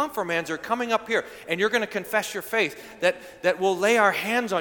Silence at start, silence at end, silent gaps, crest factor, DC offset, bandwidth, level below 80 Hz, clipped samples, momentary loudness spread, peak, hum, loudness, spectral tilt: 0 s; 0 s; none; 18 dB; under 0.1%; 19 kHz; -66 dBFS; under 0.1%; 7 LU; -6 dBFS; none; -24 LUFS; -3.5 dB/octave